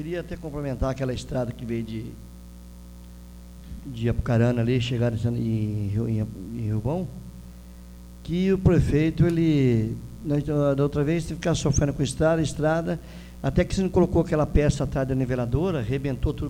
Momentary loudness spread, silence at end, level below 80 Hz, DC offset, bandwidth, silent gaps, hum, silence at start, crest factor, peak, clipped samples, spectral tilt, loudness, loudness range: 23 LU; 0 s; -38 dBFS; under 0.1%; 16 kHz; none; 60 Hz at -40 dBFS; 0 s; 18 dB; -6 dBFS; under 0.1%; -7 dB/octave; -25 LUFS; 8 LU